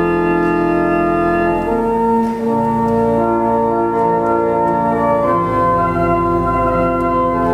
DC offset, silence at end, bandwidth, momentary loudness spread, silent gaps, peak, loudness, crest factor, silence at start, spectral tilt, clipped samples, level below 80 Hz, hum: under 0.1%; 0 s; 13 kHz; 1 LU; none; -4 dBFS; -15 LUFS; 12 dB; 0 s; -8.5 dB/octave; under 0.1%; -34 dBFS; none